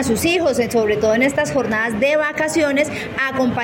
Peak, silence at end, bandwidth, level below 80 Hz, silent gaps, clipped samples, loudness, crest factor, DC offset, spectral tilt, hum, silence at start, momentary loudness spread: -6 dBFS; 0 s; 17 kHz; -48 dBFS; none; under 0.1%; -17 LUFS; 12 dB; under 0.1%; -4.5 dB/octave; none; 0 s; 3 LU